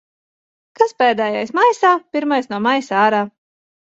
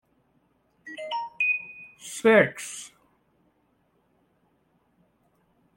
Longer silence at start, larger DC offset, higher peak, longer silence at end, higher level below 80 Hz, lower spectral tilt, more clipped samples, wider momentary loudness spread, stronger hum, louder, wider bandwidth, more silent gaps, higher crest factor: about the same, 0.8 s vs 0.85 s; neither; first, -2 dBFS vs -6 dBFS; second, 0.65 s vs 2.9 s; first, -68 dBFS vs -76 dBFS; about the same, -4.5 dB/octave vs -4 dB/octave; neither; second, 6 LU vs 23 LU; neither; first, -16 LUFS vs -24 LUFS; second, 8 kHz vs 16.5 kHz; neither; second, 16 dB vs 24 dB